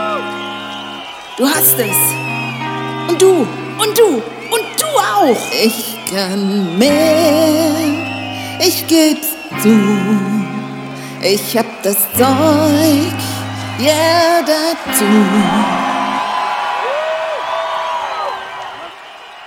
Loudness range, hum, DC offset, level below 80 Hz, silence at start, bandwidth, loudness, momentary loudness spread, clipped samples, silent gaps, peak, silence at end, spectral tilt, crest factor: 2 LU; none; under 0.1%; -54 dBFS; 0 s; over 20 kHz; -14 LUFS; 12 LU; under 0.1%; none; 0 dBFS; 0 s; -4 dB/octave; 14 dB